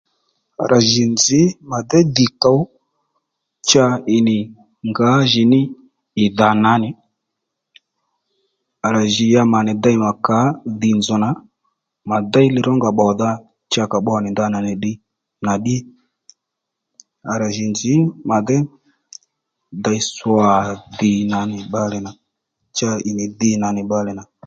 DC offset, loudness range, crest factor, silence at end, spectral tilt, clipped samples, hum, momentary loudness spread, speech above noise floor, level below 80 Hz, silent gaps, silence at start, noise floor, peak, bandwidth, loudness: under 0.1%; 5 LU; 18 dB; 0.25 s; -5 dB/octave; under 0.1%; none; 12 LU; 64 dB; -54 dBFS; none; 0.6 s; -80 dBFS; 0 dBFS; 7.8 kHz; -17 LUFS